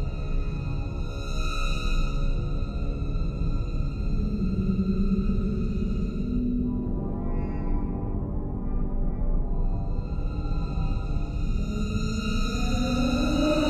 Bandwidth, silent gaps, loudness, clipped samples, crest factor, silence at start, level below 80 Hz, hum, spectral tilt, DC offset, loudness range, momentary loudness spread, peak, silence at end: 8.4 kHz; none; -29 LUFS; under 0.1%; 14 dB; 0 s; -28 dBFS; none; -7 dB/octave; under 0.1%; 3 LU; 6 LU; -12 dBFS; 0 s